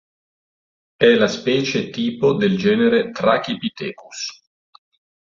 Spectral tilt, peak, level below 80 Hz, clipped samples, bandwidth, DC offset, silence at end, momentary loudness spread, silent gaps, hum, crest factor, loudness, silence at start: -5 dB/octave; -2 dBFS; -58 dBFS; under 0.1%; 7.4 kHz; under 0.1%; 0.9 s; 14 LU; none; none; 18 dB; -18 LUFS; 1 s